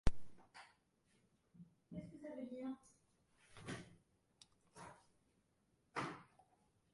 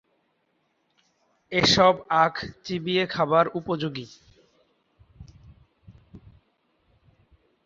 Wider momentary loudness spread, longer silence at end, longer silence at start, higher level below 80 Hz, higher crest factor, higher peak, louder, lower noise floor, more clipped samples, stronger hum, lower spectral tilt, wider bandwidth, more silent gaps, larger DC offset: first, 20 LU vs 15 LU; second, 0.7 s vs 1.5 s; second, 0.05 s vs 1.5 s; about the same, -56 dBFS vs -56 dBFS; about the same, 28 dB vs 24 dB; second, -18 dBFS vs -4 dBFS; second, -52 LUFS vs -23 LUFS; first, -80 dBFS vs -72 dBFS; neither; neither; about the same, -5.5 dB/octave vs -4.5 dB/octave; first, 11.5 kHz vs 7.6 kHz; neither; neither